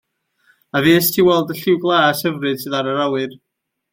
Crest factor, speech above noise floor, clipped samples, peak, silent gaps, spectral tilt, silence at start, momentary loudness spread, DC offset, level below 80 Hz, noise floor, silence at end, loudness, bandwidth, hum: 16 dB; 43 dB; under 0.1%; -2 dBFS; none; -4.5 dB/octave; 0.75 s; 9 LU; under 0.1%; -58 dBFS; -60 dBFS; 0.55 s; -16 LUFS; 17 kHz; none